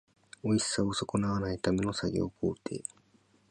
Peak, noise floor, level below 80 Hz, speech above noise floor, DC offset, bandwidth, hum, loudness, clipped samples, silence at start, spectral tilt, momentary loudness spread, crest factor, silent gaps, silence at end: -14 dBFS; -66 dBFS; -54 dBFS; 35 dB; under 0.1%; 11 kHz; none; -32 LUFS; under 0.1%; 0.45 s; -5 dB/octave; 10 LU; 18 dB; none; 0.7 s